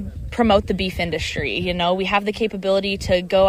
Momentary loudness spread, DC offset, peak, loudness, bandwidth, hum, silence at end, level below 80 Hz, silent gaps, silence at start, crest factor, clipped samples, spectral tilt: 6 LU; under 0.1%; -4 dBFS; -21 LUFS; 16 kHz; none; 0 s; -36 dBFS; none; 0 s; 16 dB; under 0.1%; -5.5 dB/octave